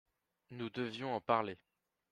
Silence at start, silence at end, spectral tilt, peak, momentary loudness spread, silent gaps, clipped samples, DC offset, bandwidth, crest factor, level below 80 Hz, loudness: 0.5 s; 0.55 s; -6.5 dB/octave; -18 dBFS; 17 LU; none; under 0.1%; under 0.1%; 10.5 kHz; 24 dB; -78 dBFS; -38 LUFS